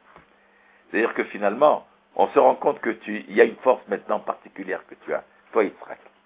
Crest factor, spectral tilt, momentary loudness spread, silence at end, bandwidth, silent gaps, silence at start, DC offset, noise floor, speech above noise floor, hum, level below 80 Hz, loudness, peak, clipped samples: 22 dB; -9 dB/octave; 14 LU; 0.3 s; 4 kHz; none; 0.9 s; under 0.1%; -57 dBFS; 35 dB; none; -74 dBFS; -23 LUFS; -2 dBFS; under 0.1%